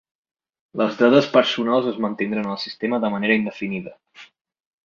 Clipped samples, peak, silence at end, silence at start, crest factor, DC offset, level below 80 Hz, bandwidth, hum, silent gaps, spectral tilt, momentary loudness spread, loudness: under 0.1%; -2 dBFS; 0.6 s; 0.75 s; 20 dB; under 0.1%; -66 dBFS; 7.2 kHz; none; none; -6 dB/octave; 13 LU; -20 LUFS